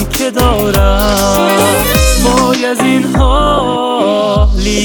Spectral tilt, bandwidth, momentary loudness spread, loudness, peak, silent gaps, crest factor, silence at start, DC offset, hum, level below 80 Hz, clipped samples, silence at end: -4.5 dB/octave; over 20 kHz; 3 LU; -10 LUFS; 0 dBFS; none; 10 dB; 0 s; under 0.1%; none; -16 dBFS; under 0.1%; 0 s